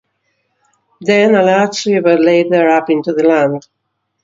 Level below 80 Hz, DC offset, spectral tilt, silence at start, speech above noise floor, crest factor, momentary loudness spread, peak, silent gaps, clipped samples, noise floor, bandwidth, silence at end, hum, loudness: -62 dBFS; under 0.1%; -5.5 dB/octave; 1 s; 54 dB; 14 dB; 6 LU; 0 dBFS; none; under 0.1%; -65 dBFS; 7.8 kHz; 0.65 s; none; -12 LUFS